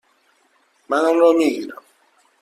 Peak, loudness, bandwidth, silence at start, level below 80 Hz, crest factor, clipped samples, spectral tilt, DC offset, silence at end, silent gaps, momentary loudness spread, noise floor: -4 dBFS; -17 LUFS; 14 kHz; 0.9 s; -70 dBFS; 18 dB; under 0.1%; -4 dB/octave; under 0.1%; 0.7 s; none; 15 LU; -61 dBFS